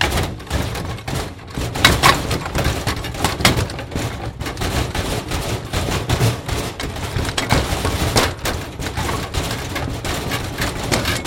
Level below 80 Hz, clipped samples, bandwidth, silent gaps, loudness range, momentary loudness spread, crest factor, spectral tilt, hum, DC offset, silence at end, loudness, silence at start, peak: -30 dBFS; under 0.1%; 16.5 kHz; none; 4 LU; 10 LU; 20 dB; -4 dB/octave; none; under 0.1%; 0 s; -20 LUFS; 0 s; 0 dBFS